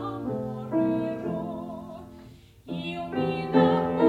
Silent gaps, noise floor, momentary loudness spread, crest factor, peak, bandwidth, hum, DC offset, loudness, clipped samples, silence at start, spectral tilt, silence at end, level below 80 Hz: none; -49 dBFS; 19 LU; 20 dB; -8 dBFS; 10 kHz; none; under 0.1%; -28 LUFS; under 0.1%; 0 s; -8.5 dB/octave; 0 s; -58 dBFS